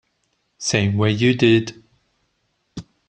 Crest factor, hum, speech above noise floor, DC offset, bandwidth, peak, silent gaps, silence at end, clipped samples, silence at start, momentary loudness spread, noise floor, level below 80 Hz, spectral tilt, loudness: 18 dB; none; 52 dB; under 0.1%; 9.2 kHz; -2 dBFS; none; 0.25 s; under 0.1%; 0.6 s; 23 LU; -69 dBFS; -54 dBFS; -5 dB/octave; -18 LUFS